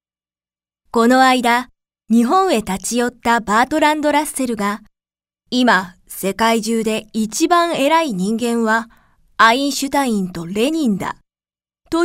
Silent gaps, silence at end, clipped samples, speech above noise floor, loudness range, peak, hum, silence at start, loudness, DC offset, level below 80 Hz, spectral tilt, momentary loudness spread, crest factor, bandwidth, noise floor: none; 0 s; under 0.1%; over 74 dB; 3 LU; 0 dBFS; none; 0.95 s; -16 LUFS; under 0.1%; -50 dBFS; -4 dB/octave; 11 LU; 18 dB; 16 kHz; under -90 dBFS